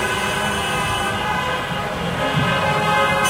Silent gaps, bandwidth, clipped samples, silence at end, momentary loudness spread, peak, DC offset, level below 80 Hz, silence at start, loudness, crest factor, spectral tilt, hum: none; 16 kHz; under 0.1%; 0 s; 6 LU; -4 dBFS; under 0.1%; -40 dBFS; 0 s; -20 LUFS; 16 dB; -4 dB/octave; none